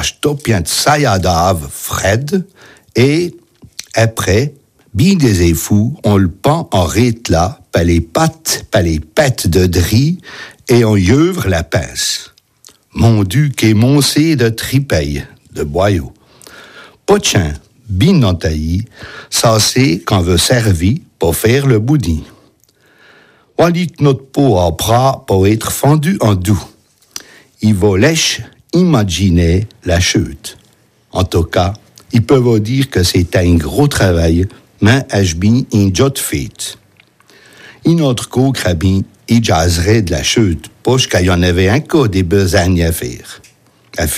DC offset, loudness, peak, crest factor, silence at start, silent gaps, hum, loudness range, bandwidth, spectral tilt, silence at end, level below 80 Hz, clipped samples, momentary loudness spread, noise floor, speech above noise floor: under 0.1%; -13 LUFS; 0 dBFS; 12 dB; 0 s; none; none; 3 LU; 15.5 kHz; -5 dB/octave; 0 s; -34 dBFS; under 0.1%; 11 LU; -51 dBFS; 39 dB